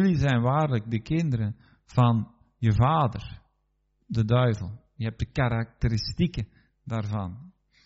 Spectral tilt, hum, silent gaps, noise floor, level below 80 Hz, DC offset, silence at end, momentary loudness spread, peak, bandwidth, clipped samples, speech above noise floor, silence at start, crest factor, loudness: -7 dB/octave; none; none; -72 dBFS; -44 dBFS; under 0.1%; 0.35 s; 16 LU; -8 dBFS; 7.8 kHz; under 0.1%; 47 dB; 0 s; 18 dB; -26 LUFS